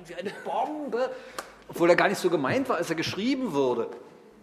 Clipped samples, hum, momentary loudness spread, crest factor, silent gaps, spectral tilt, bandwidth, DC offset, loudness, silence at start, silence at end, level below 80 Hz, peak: under 0.1%; none; 17 LU; 20 dB; none; -5 dB/octave; 15.5 kHz; under 0.1%; -27 LUFS; 0 s; 0.35 s; -66 dBFS; -6 dBFS